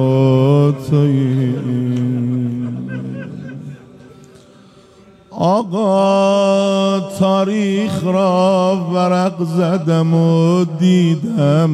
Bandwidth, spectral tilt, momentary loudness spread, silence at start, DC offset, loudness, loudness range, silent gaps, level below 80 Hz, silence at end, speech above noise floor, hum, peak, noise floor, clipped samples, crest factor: 12.5 kHz; -7.5 dB/octave; 12 LU; 0 s; under 0.1%; -15 LUFS; 9 LU; none; -58 dBFS; 0 s; 31 dB; none; -4 dBFS; -45 dBFS; under 0.1%; 12 dB